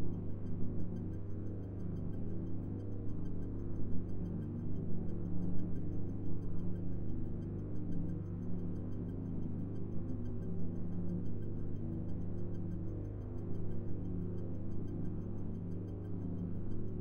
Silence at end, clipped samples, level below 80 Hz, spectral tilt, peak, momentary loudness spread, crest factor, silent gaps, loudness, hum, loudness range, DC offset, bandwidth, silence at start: 0 s; under 0.1%; -48 dBFS; -11.5 dB/octave; -20 dBFS; 2 LU; 14 dB; none; -42 LUFS; 50 Hz at -45 dBFS; 1 LU; 0.5%; 3.1 kHz; 0 s